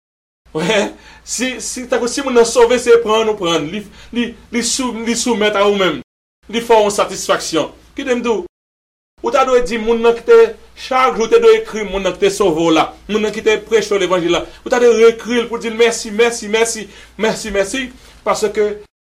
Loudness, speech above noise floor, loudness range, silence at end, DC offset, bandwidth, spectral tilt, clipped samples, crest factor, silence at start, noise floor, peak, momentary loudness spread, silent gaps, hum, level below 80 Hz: -15 LUFS; over 75 dB; 4 LU; 0.25 s; under 0.1%; 15 kHz; -3 dB/octave; under 0.1%; 14 dB; 0.55 s; under -90 dBFS; -2 dBFS; 12 LU; 6.04-6.42 s, 8.49-9.17 s; none; -42 dBFS